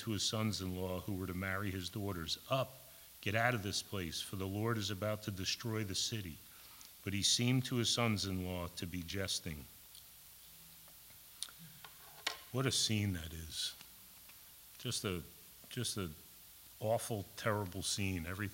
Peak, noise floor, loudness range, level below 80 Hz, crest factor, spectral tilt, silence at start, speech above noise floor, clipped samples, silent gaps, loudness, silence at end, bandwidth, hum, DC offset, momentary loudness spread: -18 dBFS; -58 dBFS; 8 LU; -62 dBFS; 22 dB; -3.5 dB/octave; 0 s; 20 dB; under 0.1%; none; -38 LUFS; 0 s; 16.5 kHz; none; under 0.1%; 21 LU